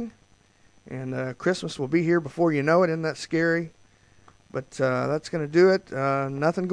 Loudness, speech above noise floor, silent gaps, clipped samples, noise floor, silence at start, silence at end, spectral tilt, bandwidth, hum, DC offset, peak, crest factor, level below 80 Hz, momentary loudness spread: -24 LUFS; 36 dB; none; under 0.1%; -60 dBFS; 0 s; 0 s; -6.5 dB/octave; 10.5 kHz; none; under 0.1%; -8 dBFS; 16 dB; -64 dBFS; 15 LU